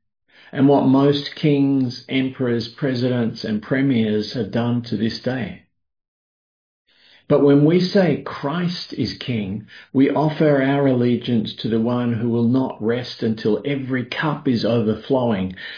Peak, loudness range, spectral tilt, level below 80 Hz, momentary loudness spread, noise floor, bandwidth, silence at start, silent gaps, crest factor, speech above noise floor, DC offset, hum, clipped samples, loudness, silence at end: -4 dBFS; 4 LU; -8 dB/octave; -58 dBFS; 9 LU; under -90 dBFS; 5.2 kHz; 0.55 s; 6.08-6.85 s; 16 dB; over 71 dB; under 0.1%; none; under 0.1%; -20 LUFS; 0 s